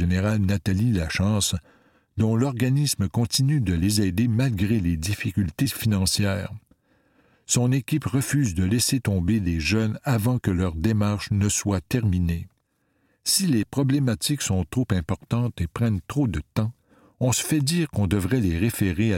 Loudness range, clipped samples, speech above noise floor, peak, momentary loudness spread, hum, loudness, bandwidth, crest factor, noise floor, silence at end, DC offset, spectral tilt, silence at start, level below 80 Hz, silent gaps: 2 LU; under 0.1%; 47 dB; -6 dBFS; 5 LU; none; -24 LUFS; 17 kHz; 16 dB; -70 dBFS; 0 s; under 0.1%; -5 dB/octave; 0 s; -42 dBFS; none